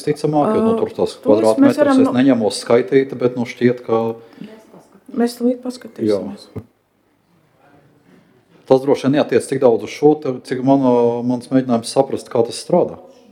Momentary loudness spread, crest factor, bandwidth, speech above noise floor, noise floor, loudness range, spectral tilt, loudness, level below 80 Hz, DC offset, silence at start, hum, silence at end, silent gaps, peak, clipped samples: 10 LU; 16 dB; 14 kHz; 45 dB; -60 dBFS; 9 LU; -6.5 dB/octave; -16 LUFS; -62 dBFS; under 0.1%; 0 s; none; 0.3 s; none; 0 dBFS; under 0.1%